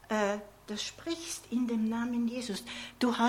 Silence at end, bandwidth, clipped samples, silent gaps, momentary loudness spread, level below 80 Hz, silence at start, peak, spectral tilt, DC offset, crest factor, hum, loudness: 0 s; 16 kHz; under 0.1%; none; 8 LU; -64 dBFS; 0.05 s; -14 dBFS; -4 dB/octave; under 0.1%; 18 dB; 50 Hz at -65 dBFS; -34 LUFS